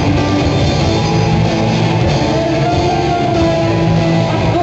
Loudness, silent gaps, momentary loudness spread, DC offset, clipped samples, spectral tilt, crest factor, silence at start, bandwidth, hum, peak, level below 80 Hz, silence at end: -13 LUFS; none; 1 LU; under 0.1%; under 0.1%; -6.5 dB/octave; 10 dB; 0 s; 8.2 kHz; none; -2 dBFS; -28 dBFS; 0 s